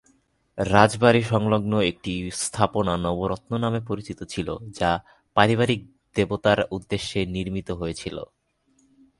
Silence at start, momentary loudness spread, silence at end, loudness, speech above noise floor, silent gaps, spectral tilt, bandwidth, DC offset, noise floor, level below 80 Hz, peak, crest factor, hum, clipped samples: 0.55 s; 13 LU; 0.95 s; -24 LUFS; 42 dB; none; -5.5 dB/octave; 11.5 kHz; under 0.1%; -65 dBFS; -46 dBFS; 0 dBFS; 24 dB; none; under 0.1%